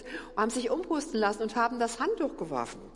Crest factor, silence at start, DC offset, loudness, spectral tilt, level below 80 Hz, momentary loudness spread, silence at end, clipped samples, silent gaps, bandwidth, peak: 18 dB; 0 s; under 0.1%; -31 LUFS; -4 dB/octave; -56 dBFS; 6 LU; 0 s; under 0.1%; none; 11.5 kHz; -14 dBFS